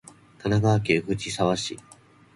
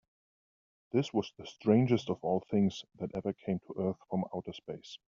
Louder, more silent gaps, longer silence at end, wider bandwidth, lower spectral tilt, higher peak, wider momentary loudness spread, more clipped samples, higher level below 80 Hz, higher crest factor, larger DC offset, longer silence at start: first, -25 LUFS vs -33 LUFS; neither; first, 0.55 s vs 0.2 s; first, 11.5 kHz vs 7.4 kHz; second, -5.5 dB/octave vs -7 dB/octave; first, -8 dBFS vs -14 dBFS; second, 12 LU vs 15 LU; neither; first, -52 dBFS vs -70 dBFS; about the same, 18 dB vs 20 dB; neither; second, 0.45 s vs 0.95 s